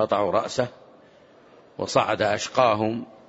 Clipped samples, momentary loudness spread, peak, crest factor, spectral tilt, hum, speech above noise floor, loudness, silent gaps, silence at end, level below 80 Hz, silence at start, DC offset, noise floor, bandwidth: under 0.1%; 10 LU; -6 dBFS; 20 dB; -4.5 dB/octave; none; 30 dB; -24 LUFS; none; 0.2 s; -62 dBFS; 0 s; under 0.1%; -53 dBFS; 8 kHz